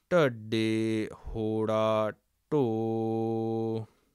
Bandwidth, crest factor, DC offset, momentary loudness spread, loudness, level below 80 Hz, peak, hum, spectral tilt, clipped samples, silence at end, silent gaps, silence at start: 12.5 kHz; 16 dB; under 0.1%; 8 LU; -30 LUFS; -54 dBFS; -14 dBFS; none; -7 dB/octave; under 0.1%; 0.3 s; none; 0.1 s